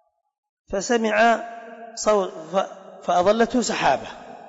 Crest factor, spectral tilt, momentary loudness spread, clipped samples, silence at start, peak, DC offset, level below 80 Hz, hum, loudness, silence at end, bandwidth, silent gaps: 14 dB; -3.5 dB/octave; 16 LU; under 0.1%; 0.7 s; -8 dBFS; under 0.1%; -54 dBFS; none; -21 LUFS; 0 s; 8 kHz; none